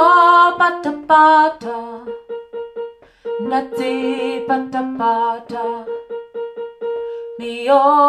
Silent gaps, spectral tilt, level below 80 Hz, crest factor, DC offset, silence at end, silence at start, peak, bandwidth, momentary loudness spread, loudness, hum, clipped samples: none; -4.5 dB/octave; -62 dBFS; 16 dB; under 0.1%; 0 s; 0 s; 0 dBFS; 13 kHz; 19 LU; -16 LUFS; none; under 0.1%